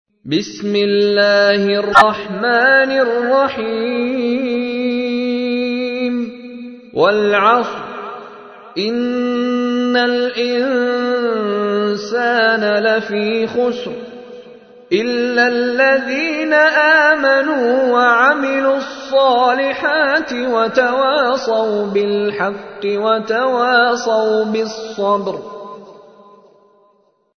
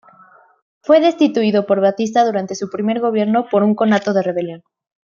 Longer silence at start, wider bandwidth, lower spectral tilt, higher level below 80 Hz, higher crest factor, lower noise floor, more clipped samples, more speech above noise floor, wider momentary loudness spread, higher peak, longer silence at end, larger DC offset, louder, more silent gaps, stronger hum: second, 0.25 s vs 0.9 s; first, 11 kHz vs 7.2 kHz; second, -4.5 dB/octave vs -6 dB/octave; first, -58 dBFS vs -66 dBFS; about the same, 16 dB vs 14 dB; first, -57 dBFS vs -48 dBFS; neither; first, 42 dB vs 33 dB; first, 12 LU vs 9 LU; about the same, 0 dBFS vs -2 dBFS; first, 1.45 s vs 0.6 s; neither; about the same, -15 LUFS vs -16 LUFS; neither; neither